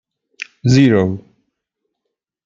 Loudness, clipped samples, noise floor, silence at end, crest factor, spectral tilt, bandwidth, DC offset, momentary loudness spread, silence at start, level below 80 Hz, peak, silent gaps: -14 LUFS; under 0.1%; -78 dBFS; 1.25 s; 16 dB; -7 dB/octave; 7.6 kHz; under 0.1%; 21 LU; 0.4 s; -52 dBFS; -2 dBFS; none